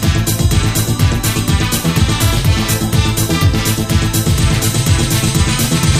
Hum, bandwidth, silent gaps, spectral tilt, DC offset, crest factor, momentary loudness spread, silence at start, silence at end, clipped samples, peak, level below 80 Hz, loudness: none; 15.5 kHz; none; -4.5 dB/octave; under 0.1%; 12 dB; 1 LU; 0 s; 0 s; under 0.1%; 0 dBFS; -22 dBFS; -14 LUFS